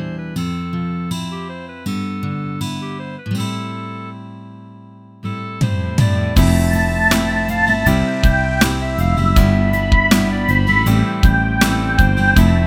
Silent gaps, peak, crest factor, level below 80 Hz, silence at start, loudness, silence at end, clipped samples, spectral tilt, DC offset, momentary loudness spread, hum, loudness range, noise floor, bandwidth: none; 0 dBFS; 16 dB; -22 dBFS; 0 s; -17 LUFS; 0 s; under 0.1%; -5.5 dB/octave; under 0.1%; 15 LU; none; 11 LU; -40 dBFS; 18.5 kHz